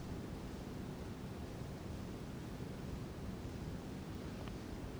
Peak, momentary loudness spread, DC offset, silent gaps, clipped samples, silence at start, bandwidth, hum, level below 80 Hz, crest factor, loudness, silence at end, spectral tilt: -30 dBFS; 1 LU; under 0.1%; none; under 0.1%; 0 s; over 20 kHz; none; -54 dBFS; 16 dB; -47 LUFS; 0 s; -6.5 dB/octave